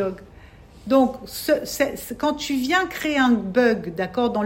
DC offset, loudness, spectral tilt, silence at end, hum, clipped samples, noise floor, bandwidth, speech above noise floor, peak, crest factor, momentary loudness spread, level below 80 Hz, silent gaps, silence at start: under 0.1%; -22 LUFS; -4.5 dB/octave; 0 s; none; under 0.1%; -46 dBFS; 16.5 kHz; 24 dB; -6 dBFS; 16 dB; 8 LU; -50 dBFS; none; 0 s